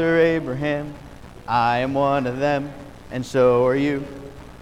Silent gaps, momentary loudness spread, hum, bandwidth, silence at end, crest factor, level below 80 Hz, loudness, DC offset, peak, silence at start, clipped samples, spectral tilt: none; 21 LU; none; 11 kHz; 0 s; 14 dB; -46 dBFS; -21 LUFS; 0.3%; -6 dBFS; 0 s; under 0.1%; -7 dB/octave